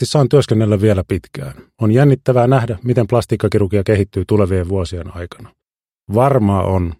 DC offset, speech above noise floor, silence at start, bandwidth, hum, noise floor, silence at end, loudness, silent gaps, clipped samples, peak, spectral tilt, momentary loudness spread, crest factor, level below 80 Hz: under 0.1%; 70 dB; 0 s; 13.5 kHz; none; -84 dBFS; 0.05 s; -15 LUFS; none; under 0.1%; 0 dBFS; -7.5 dB/octave; 15 LU; 14 dB; -38 dBFS